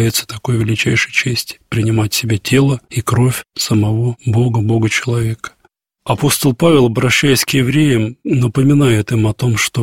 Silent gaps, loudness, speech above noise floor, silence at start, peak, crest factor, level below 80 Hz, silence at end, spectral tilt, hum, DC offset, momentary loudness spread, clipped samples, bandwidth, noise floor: none; -14 LUFS; 44 dB; 0 s; 0 dBFS; 14 dB; -42 dBFS; 0 s; -5 dB/octave; none; under 0.1%; 8 LU; under 0.1%; 16.5 kHz; -57 dBFS